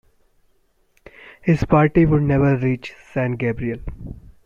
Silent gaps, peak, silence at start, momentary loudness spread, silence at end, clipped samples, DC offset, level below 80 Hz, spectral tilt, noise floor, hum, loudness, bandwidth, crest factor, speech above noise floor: none; -4 dBFS; 1.45 s; 17 LU; 0.25 s; under 0.1%; under 0.1%; -38 dBFS; -9.5 dB/octave; -61 dBFS; none; -19 LUFS; 7.2 kHz; 18 dB; 43 dB